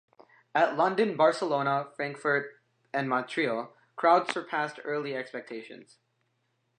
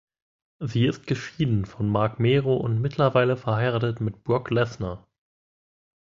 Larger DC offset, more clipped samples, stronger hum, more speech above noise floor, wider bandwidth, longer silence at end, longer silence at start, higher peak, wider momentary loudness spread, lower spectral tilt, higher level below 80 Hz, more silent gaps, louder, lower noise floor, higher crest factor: neither; neither; neither; second, 47 dB vs over 66 dB; first, 9.8 kHz vs 7.4 kHz; about the same, 0.95 s vs 1.05 s; about the same, 0.55 s vs 0.6 s; about the same, -8 dBFS vs -6 dBFS; first, 15 LU vs 9 LU; second, -5.5 dB/octave vs -7.5 dB/octave; second, -86 dBFS vs -50 dBFS; neither; second, -28 LUFS vs -24 LUFS; second, -76 dBFS vs under -90 dBFS; about the same, 20 dB vs 18 dB